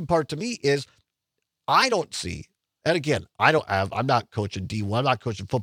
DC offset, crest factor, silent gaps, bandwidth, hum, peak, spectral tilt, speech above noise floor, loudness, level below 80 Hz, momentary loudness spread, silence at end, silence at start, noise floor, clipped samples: under 0.1%; 24 dB; none; 16 kHz; none; -2 dBFS; -5 dB/octave; 58 dB; -24 LUFS; -58 dBFS; 11 LU; 0 s; 0 s; -82 dBFS; under 0.1%